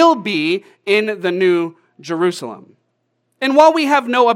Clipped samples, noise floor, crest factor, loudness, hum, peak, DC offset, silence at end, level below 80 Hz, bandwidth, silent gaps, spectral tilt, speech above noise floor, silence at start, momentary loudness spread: under 0.1%; -68 dBFS; 16 dB; -16 LUFS; none; 0 dBFS; under 0.1%; 0 s; -76 dBFS; 15 kHz; none; -5 dB/octave; 53 dB; 0 s; 15 LU